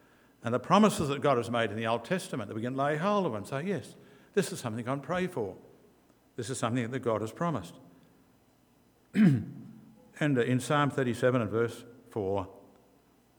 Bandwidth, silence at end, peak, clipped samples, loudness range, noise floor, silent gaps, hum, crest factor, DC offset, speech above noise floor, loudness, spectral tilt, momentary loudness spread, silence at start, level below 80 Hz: over 20 kHz; 0.8 s; -10 dBFS; under 0.1%; 7 LU; -65 dBFS; none; none; 22 dB; under 0.1%; 35 dB; -30 LUFS; -6 dB/octave; 15 LU; 0.45 s; -68 dBFS